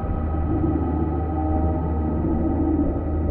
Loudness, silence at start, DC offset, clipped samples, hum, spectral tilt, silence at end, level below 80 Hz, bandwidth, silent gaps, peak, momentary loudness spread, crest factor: -23 LUFS; 0 s; under 0.1%; under 0.1%; none; -11.5 dB/octave; 0 s; -26 dBFS; 3.1 kHz; none; -10 dBFS; 3 LU; 12 dB